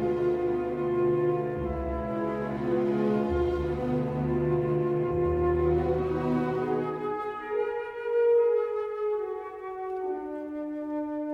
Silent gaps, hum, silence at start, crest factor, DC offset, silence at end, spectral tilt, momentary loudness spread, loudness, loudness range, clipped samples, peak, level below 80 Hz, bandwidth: none; none; 0 s; 14 dB; under 0.1%; 0 s; -9.5 dB/octave; 8 LU; -28 LUFS; 2 LU; under 0.1%; -14 dBFS; -44 dBFS; 5.6 kHz